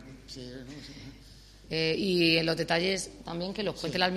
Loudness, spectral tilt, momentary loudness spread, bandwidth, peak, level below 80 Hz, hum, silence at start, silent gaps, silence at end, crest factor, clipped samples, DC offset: -28 LUFS; -4.5 dB/octave; 21 LU; 13 kHz; -8 dBFS; -54 dBFS; none; 0 s; none; 0 s; 22 dB; under 0.1%; under 0.1%